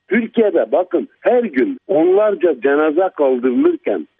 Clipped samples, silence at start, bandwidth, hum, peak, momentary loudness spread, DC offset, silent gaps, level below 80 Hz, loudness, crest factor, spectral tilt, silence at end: under 0.1%; 0.1 s; 3.8 kHz; none; -2 dBFS; 5 LU; under 0.1%; none; -68 dBFS; -16 LUFS; 14 dB; -9.5 dB/octave; 0.15 s